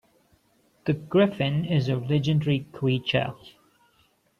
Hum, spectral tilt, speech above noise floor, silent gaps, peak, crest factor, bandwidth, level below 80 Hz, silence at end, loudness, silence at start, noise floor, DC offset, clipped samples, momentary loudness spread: none; -8 dB/octave; 41 dB; none; -8 dBFS; 18 dB; 7 kHz; -60 dBFS; 0.9 s; -25 LUFS; 0.85 s; -65 dBFS; under 0.1%; under 0.1%; 8 LU